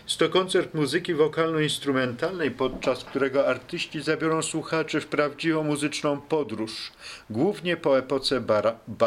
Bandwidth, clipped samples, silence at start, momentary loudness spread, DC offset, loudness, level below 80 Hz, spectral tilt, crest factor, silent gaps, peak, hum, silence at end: 14.5 kHz; under 0.1%; 0.05 s; 6 LU; under 0.1%; -26 LUFS; -58 dBFS; -4.5 dB/octave; 18 dB; none; -6 dBFS; none; 0 s